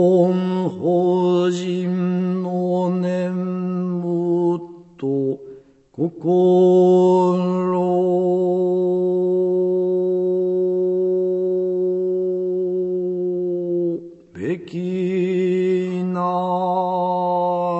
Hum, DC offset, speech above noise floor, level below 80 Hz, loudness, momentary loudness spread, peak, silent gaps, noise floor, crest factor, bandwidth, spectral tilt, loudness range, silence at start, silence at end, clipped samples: none; under 0.1%; 27 dB; -66 dBFS; -20 LUFS; 8 LU; -6 dBFS; none; -43 dBFS; 14 dB; 8 kHz; -9 dB/octave; 6 LU; 0 s; 0 s; under 0.1%